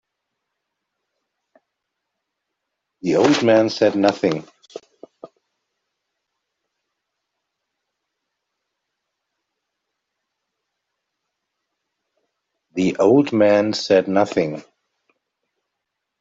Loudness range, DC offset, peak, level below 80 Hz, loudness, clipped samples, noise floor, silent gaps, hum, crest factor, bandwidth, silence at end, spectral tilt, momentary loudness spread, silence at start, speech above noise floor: 9 LU; under 0.1%; -4 dBFS; -66 dBFS; -18 LUFS; under 0.1%; -80 dBFS; none; none; 20 dB; 7.8 kHz; 1.6 s; -5.5 dB/octave; 12 LU; 3.05 s; 63 dB